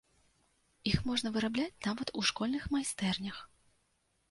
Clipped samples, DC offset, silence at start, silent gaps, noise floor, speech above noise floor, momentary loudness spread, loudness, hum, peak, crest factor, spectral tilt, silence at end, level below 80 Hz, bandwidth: under 0.1%; under 0.1%; 0.85 s; none; -76 dBFS; 42 dB; 6 LU; -34 LUFS; none; -14 dBFS; 22 dB; -4 dB/octave; 0.85 s; -54 dBFS; 11.5 kHz